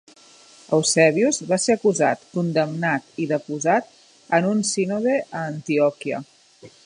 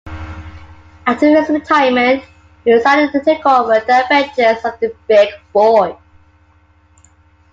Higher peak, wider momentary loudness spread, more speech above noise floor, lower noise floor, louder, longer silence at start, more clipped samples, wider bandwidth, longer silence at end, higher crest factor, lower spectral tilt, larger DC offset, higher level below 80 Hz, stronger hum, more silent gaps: about the same, -2 dBFS vs 0 dBFS; about the same, 9 LU vs 10 LU; second, 29 dB vs 38 dB; about the same, -50 dBFS vs -51 dBFS; second, -21 LUFS vs -13 LUFS; first, 0.7 s vs 0.05 s; neither; first, 11.5 kHz vs 7.6 kHz; second, 0.15 s vs 1.6 s; first, 20 dB vs 14 dB; about the same, -4.5 dB/octave vs -5.5 dB/octave; neither; second, -70 dBFS vs -46 dBFS; neither; neither